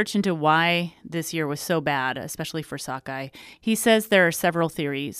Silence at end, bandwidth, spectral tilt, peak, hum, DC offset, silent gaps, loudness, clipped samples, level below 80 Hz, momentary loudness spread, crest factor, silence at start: 0 s; 15.5 kHz; -4.5 dB/octave; -4 dBFS; none; under 0.1%; none; -23 LUFS; under 0.1%; -62 dBFS; 13 LU; 20 dB; 0 s